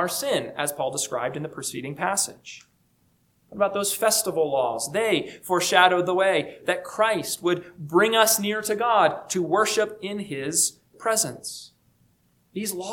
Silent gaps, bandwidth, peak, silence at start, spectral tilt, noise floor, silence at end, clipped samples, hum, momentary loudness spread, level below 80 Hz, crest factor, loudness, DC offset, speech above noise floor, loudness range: none; 19 kHz; -2 dBFS; 0 s; -2.5 dB/octave; -65 dBFS; 0 s; under 0.1%; none; 12 LU; -68 dBFS; 24 dB; -23 LUFS; under 0.1%; 41 dB; 6 LU